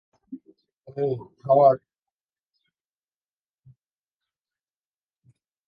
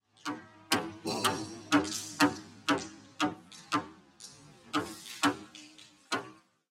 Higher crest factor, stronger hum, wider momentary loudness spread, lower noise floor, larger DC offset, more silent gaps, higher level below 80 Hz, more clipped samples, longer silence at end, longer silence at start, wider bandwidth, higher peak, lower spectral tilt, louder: about the same, 22 dB vs 24 dB; neither; first, 26 LU vs 21 LU; first, under -90 dBFS vs -56 dBFS; neither; first, 0.77-0.81 s vs none; about the same, -74 dBFS vs -72 dBFS; neither; first, 3.9 s vs 0.35 s; about the same, 0.3 s vs 0.25 s; second, 5 kHz vs 16 kHz; first, -6 dBFS vs -10 dBFS; first, -10.5 dB/octave vs -3 dB/octave; first, -22 LUFS vs -33 LUFS